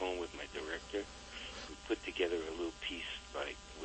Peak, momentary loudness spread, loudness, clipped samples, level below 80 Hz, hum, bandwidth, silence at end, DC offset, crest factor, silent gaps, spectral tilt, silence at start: -22 dBFS; 9 LU; -41 LUFS; under 0.1%; -58 dBFS; none; 8.4 kHz; 0 s; under 0.1%; 20 dB; none; -3.5 dB/octave; 0 s